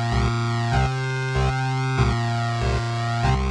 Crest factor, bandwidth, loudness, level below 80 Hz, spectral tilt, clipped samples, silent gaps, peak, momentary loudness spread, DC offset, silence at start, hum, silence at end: 16 dB; 10.5 kHz; -23 LUFS; -30 dBFS; -6 dB/octave; under 0.1%; none; -6 dBFS; 3 LU; under 0.1%; 0 s; none; 0 s